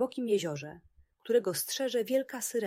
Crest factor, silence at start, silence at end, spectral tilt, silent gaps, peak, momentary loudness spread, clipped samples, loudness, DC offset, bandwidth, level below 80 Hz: 16 dB; 0 s; 0 s; -3.5 dB/octave; none; -16 dBFS; 12 LU; under 0.1%; -31 LUFS; under 0.1%; 16 kHz; -72 dBFS